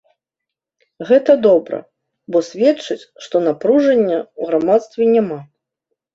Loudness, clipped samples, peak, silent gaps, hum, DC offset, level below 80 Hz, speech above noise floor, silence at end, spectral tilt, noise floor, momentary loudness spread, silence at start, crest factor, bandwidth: -16 LUFS; under 0.1%; -2 dBFS; none; none; under 0.1%; -64 dBFS; 68 dB; 0.7 s; -6.5 dB/octave; -83 dBFS; 15 LU; 1 s; 16 dB; 7.8 kHz